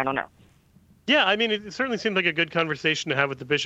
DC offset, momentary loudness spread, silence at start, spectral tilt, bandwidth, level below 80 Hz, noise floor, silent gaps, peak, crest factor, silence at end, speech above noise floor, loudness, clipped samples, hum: under 0.1%; 8 LU; 0 s; -4 dB/octave; 8.4 kHz; -64 dBFS; -57 dBFS; none; -4 dBFS; 20 dB; 0 s; 33 dB; -23 LUFS; under 0.1%; none